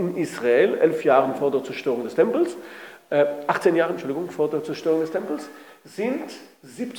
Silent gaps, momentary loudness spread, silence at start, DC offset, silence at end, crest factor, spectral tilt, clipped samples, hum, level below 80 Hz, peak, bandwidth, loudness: none; 17 LU; 0 s; under 0.1%; 0 s; 18 dB; -6 dB/octave; under 0.1%; none; -82 dBFS; -6 dBFS; 19.5 kHz; -23 LUFS